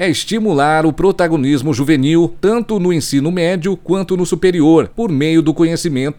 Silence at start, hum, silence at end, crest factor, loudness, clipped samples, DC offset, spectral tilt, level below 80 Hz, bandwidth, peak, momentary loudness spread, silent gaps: 0 s; none; 0.05 s; 14 dB; -14 LUFS; under 0.1%; under 0.1%; -6 dB/octave; -40 dBFS; 17.5 kHz; 0 dBFS; 5 LU; none